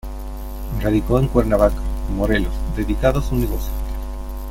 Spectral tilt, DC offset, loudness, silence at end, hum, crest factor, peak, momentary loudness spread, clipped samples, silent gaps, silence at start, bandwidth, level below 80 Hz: -7.5 dB/octave; under 0.1%; -21 LUFS; 0 s; none; 18 dB; -2 dBFS; 14 LU; under 0.1%; none; 0.05 s; 16.5 kHz; -24 dBFS